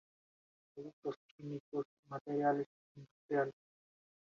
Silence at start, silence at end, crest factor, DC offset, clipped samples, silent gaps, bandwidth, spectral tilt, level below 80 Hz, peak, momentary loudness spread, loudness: 0.75 s; 0.85 s; 20 dB; under 0.1%; under 0.1%; 0.93-1.02 s, 1.16-1.38 s, 1.60-1.72 s, 1.85-2.03 s, 2.21-2.25 s, 2.66-2.95 s, 3.11-3.29 s; 7 kHz; -6.5 dB/octave; -86 dBFS; -22 dBFS; 23 LU; -40 LUFS